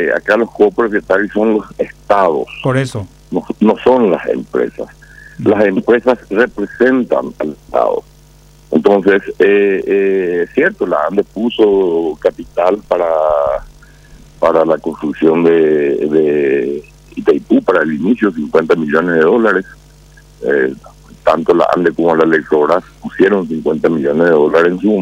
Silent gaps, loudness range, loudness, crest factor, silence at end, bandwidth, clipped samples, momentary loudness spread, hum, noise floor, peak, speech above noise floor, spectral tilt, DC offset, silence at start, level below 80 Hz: none; 2 LU; -13 LUFS; 12 dB; 0 s; 10.5 kHz; under 0.1%; 8 LU; none; -42 dBFS; 0 dBFS; 30 dB; -7 dB/octave; under 0.1%; 0 s; -44 dBFS